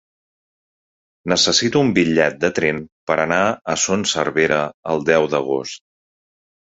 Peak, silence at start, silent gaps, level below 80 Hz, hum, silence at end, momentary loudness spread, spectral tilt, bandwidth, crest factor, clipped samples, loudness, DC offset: 0 dBFS; 1.25 s; 2.92-3.07 s, 3.61-3.65 s, 4.74-4.83 s; -52 dBFS; none; 1 s; 9 LU; -3.5 dB/octave; 8.2 kHz; 20 dB; under 0.1%; -18 LUFS; under 0.1%